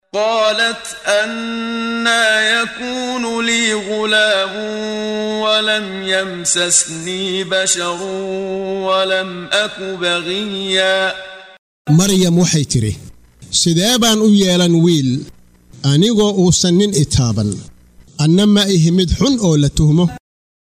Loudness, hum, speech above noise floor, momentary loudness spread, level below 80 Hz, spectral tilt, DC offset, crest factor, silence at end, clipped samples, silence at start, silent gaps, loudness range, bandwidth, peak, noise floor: -15 LUFS; none; 21 dB; 10 LU; -36 dBFS; -4 dB/octave; under 0.1%; 14 dB; 0.5 s; under 0.1%; 0.15 s; 11.59-11.85 s; 4 LU; 16 kHz; -2 dBFS; -36 dBFS